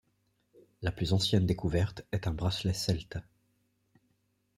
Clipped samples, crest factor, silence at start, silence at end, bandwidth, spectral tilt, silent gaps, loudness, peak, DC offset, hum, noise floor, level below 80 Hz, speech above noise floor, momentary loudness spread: under 0.1%; 20 dB; 0.8 s; 1.35 s; 14.5 kHz; -5.5 dB/octave; none; -31 LUFS; -12 dBFS; under 0.1%; none; -75 dBFS; -50 dBFS; 45 dB; 10 LU